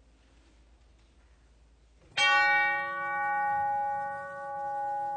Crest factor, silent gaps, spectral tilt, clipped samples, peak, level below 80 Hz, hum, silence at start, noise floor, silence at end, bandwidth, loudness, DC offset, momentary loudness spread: 18 dB; none; -1 dB/octave; under 0.1%; -14 dBFS; -64 dBFS; none; 2.15 s; -60 dBFS; 0 s; 9.4 kHz; -28 LUFS; under 0.1%; 14 LU